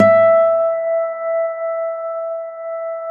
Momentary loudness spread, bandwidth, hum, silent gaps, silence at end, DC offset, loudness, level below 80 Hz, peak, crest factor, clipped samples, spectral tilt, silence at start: 14 LU; 4.2 kHz; none; none; 0 s; under 0.1%; -18 LUFS; -72 dBFS; -2 dBFS; 16 dB; under 0.1%; -8 dB/octave; 0 s